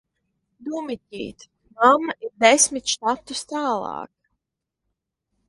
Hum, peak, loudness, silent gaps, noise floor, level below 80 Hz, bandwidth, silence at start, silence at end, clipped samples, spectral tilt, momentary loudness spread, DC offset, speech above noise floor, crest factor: none; 0 dBFS; -20 LUFS; none; -83 dBFS; -64 dBFS; 11.5 kHz; 0.6 s; 1.4 s; under 0.1%; -1 dB/octave; 19 LU; under 0.1%; 61 dB; 24 dB